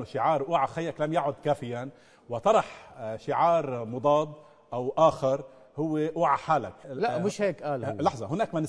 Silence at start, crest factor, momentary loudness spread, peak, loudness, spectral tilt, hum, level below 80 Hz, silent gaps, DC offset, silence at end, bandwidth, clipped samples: 0 s; 18 dB; 14 LU; -10 dBFS; -28 LUFS; -6.5 dB/octave; none; -64 dBFS; none; under 0.1%; 0 s; 11 kHz; under 0.1%